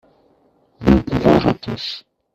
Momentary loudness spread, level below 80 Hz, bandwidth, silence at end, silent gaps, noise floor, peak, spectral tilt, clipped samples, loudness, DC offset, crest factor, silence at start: 13 LU; -34 dBFS; 13 kHz; 0.35 s; none; -58 dBFS; 0 dBFS; -7.5 dB/octave; under 0.1%; -17 LUFS; under 0.1%; 18 dB; 0.8 s